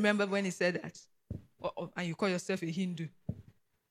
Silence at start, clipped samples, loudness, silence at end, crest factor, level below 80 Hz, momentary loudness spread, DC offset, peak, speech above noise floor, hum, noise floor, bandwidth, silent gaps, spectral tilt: 0 s; under 0.1%; -35 LUFS; 0.5 s; 20 dB; -64 dBFS; 17 LU; under 0.1%; -16 dBFS; 29 dB; none; -63 dBFS; 14 kHz; none; -5.5 dB/octave